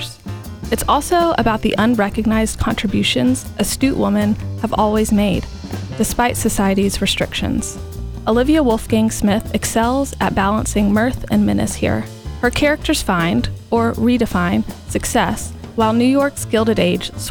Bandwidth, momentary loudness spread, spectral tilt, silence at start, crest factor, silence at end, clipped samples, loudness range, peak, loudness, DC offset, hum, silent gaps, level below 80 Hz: 20 kHz; 8 LU; -5 dB/octave; 0 s; 16 dB; 0 s; under 0.1%; 1 LU; -2 dBFS; -17 LUFS; under 0.1%; none; none; -32 dBFS